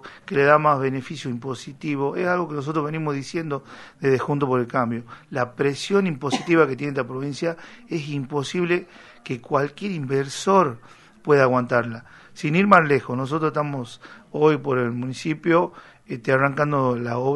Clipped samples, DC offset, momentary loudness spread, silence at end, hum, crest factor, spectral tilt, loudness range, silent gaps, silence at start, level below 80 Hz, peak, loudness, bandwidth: under 0.1%; under 0.1%; 14 LU; 0 s; none; 22 dB; -6.5 dB/octave; 5 LU; none; 0.05 s; -62 dBFS; 0 dBFS; -22 LUFS; 11.5 kHz